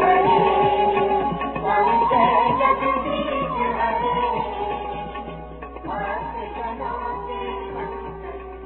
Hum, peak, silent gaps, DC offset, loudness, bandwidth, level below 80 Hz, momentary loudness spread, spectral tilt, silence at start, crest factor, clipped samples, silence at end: none; -6 dBFS; none; under 0.1%; -21 LUFS; 4.2 kHz; -42 dBFS; 16 LU; -9.5 dB/octave; 0 s; 16 dB; under 0.1%; 0 s